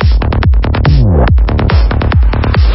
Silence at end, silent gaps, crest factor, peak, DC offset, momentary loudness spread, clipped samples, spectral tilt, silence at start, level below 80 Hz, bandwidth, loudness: 0 s; none; 8 dB; 0 dBFS; under 0.1%; 2 LU; under 0.1%; -11.5 dB/octave; 0 s; -10 dBFS; 5.8 kHz; -10 LUFS